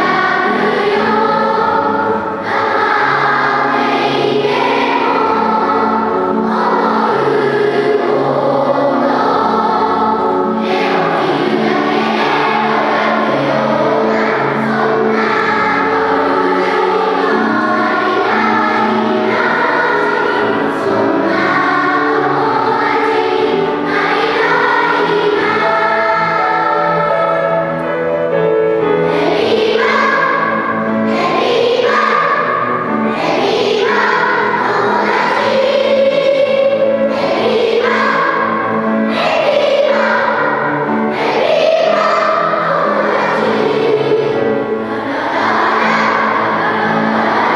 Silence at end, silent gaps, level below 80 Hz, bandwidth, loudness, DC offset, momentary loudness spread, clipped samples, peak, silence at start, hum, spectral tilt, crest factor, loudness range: 0 s; none; -56 dBFS; 11.5 kHz; -13 LUFS; under 0.1%; 3 LU; under 0.1%; 0 dBFS; 0 s; none; -5.5 dB/octave; 12 dB; 1 LU